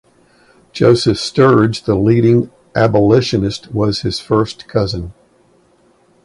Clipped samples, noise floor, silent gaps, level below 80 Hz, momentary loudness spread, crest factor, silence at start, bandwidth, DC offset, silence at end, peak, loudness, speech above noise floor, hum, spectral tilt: under 0.1%; -53 dBFS; none; -40 dBFS; 9 LU; 14 dB; 0.75 s; 11.5 kHz; under 0.1%; 1.15 s; 0 dBFS; -14 LUFS; 40 dB; none; -6.5 dB/octave